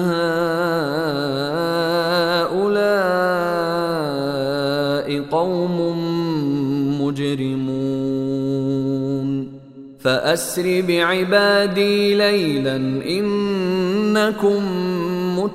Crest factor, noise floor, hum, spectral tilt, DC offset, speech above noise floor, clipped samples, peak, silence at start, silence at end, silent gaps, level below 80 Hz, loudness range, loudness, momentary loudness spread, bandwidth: 16 dB; -39 dBFS; none; -5.5 dB/octave; under 0.1%; 21 dB; under 0.1%; -2 dBFS; 0 s; 0 s; none; -54 dBFS; 4 LU; -19 LUFS; 6 LU; 16 kHz